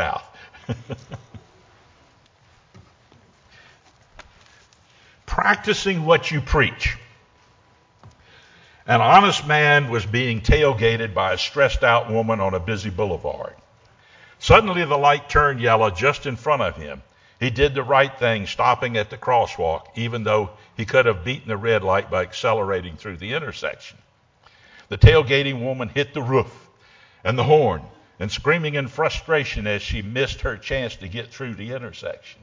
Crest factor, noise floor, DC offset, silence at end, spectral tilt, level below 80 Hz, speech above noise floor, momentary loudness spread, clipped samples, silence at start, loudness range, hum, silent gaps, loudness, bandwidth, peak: 22 dB; -57 dBFS; under 0.1%; 0.1 s; -5.5 dB/octave; -36 dBFS; 37 dB; 17 LU; under 0.1%; 0 s; 6 LU; none; none; -20 LUFS; 7.6 kHz; 0 dBFS